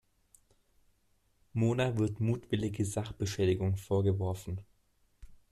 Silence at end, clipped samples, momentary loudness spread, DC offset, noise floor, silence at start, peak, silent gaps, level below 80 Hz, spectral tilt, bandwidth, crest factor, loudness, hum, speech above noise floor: 0.15 s; under 0.1%; 9 LU; under 0.1%; -72 dBFS; 1.55 s; -18 dBFS; none; -58 dBFS; -6.5 dB/octave; 13.5 kHz; 16 dB; -33 LUFS; none; 40 dB